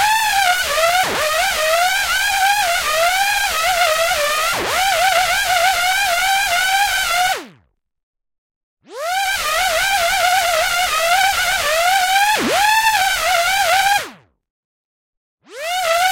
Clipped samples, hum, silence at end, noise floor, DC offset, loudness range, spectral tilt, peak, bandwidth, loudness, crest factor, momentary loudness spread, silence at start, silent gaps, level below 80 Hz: under 0.1%; none; 0 s; -57 dBFS; under 0.1%; 4 LU; 0.5 dB/octave; 0 dBFS; 17 kHz; -15 LUFS; 16 dB; 3 LU; 0 s; 8.03-8.13 s, 8.38-8.50 s, 8.56-8.77 s, 14.50-15.38 s; -44 dBFS